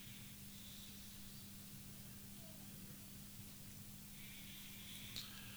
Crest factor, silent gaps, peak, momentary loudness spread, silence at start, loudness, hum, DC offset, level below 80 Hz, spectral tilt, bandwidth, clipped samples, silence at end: 26 dB; none; -28 dBFS; 4 LU; 0 s; -52 LUFS; none; under 0.1%; -68 dBFS; -3 dB/octave; over 20 kHz; under 0.1%; 0 s